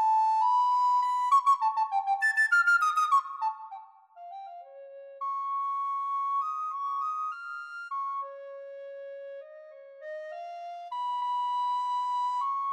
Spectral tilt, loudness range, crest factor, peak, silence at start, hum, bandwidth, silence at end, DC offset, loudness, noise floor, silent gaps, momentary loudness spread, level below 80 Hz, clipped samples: 3 dB/octave; 14 LU; 14 dB; -14 dBFS; 0 s; none; 15 kHz; 0 s; under 0.1%; -28 LUFS; -49 dBFS; none; 21 LU; under -90 dBFS; under 0.1%